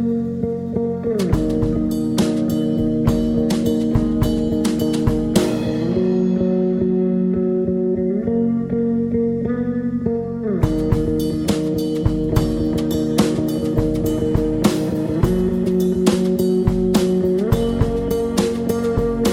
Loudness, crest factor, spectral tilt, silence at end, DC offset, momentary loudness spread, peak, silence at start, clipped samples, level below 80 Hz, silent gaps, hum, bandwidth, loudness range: -19 LUFS; 16 dB; -7 dB/octave; 0 s; under 0.1%; 3 LU; -2 dBFS; 0 s; under 0.1%; -32 dBFS; none; none; 17 kHz; 2 LU